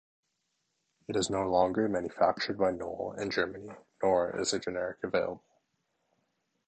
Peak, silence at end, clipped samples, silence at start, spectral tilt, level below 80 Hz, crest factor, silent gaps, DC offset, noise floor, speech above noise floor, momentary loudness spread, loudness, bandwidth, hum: -12 dBFS; 1.3 s; under 0.1%; 1.1 s; -4 dB/octave; -62 dBFS; 20 dB; none; under 0.1%; -80 dBFS; 50 dB; 10 LU; -31 LUFS; 9 kHz; none